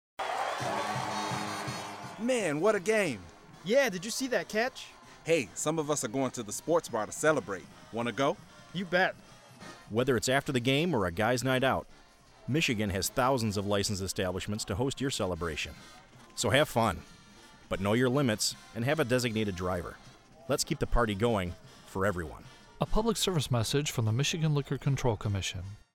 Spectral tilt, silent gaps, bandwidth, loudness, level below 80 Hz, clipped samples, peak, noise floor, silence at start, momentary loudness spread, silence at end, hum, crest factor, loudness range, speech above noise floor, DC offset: -4.5 dB/octave; none; 16.5 kHz; -30 LUFS; -48 dBFS; under 0.1%; -10 dBFS; -55 dBFS; 0.2 s; 13 LU; 0.15 s; none; 20 dB; 2 LU; 25 dB; under 0.1%